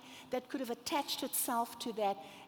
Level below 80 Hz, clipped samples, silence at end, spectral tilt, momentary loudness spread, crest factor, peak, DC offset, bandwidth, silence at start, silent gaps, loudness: -80 dBFS; under 0.1%; 0 s; -2 dB/octave; 7 LU; 16 dB; -22 dBFS; under 0.1%; over 20 kHz; 0 s; none; -37 LUFS